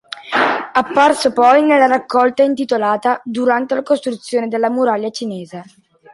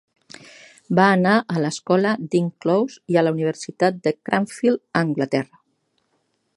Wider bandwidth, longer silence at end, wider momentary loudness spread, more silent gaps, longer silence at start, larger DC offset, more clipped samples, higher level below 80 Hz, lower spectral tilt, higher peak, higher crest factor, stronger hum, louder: about the same, 11.5 kHz vs 11.5 kHz; second, 0.5 s vs 1.1 s; first, 11 LU vs 7 LU; neither; second, 0.15 s vs 0.9 s; neither; neither; first, -62 dBFS vs -68 dBFS; second, -4 dB/octave vs -6.5 dB/octave; about the same, -2 dBFS vs 0 dBFS; second, 14 dB vs 20 dB; neither; first, -15 LUFS vs -21 LUFS